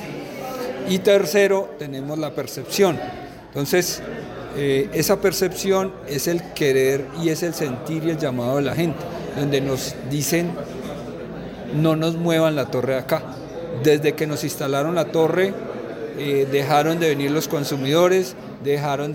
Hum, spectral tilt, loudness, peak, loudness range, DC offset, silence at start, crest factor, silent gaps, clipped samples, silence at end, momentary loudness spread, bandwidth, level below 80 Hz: none; -5 dB/octave; -21 LUFS; -4 dBFS; 3 LU; under 0.1%; 0 s; 16 dB; none; under 0.1%; 0 s; 13 LU; 17 kHz; -52 dBFS